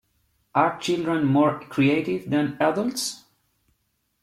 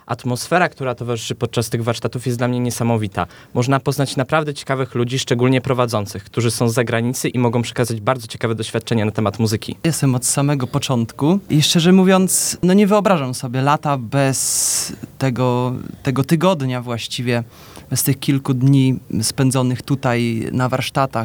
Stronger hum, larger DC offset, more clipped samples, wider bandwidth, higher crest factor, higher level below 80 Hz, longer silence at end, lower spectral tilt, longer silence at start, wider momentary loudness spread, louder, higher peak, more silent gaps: neither; neither; neither; second, 14 kHz vs 20 kHz; about the same, 18 dB vs 18 dB; second, -62 dBFS vs -52 dBFS; first, 1.05 s vs 0 s; about the same, -5.5 dB/octave vs -5 dB/octave; first, 0.55 s vs 0.1 s; about the same, 6 LU vs 8 LU; second, -23 LUFS vs -18 LUFS; second, -6 dBFS vs 0 dBFS; neither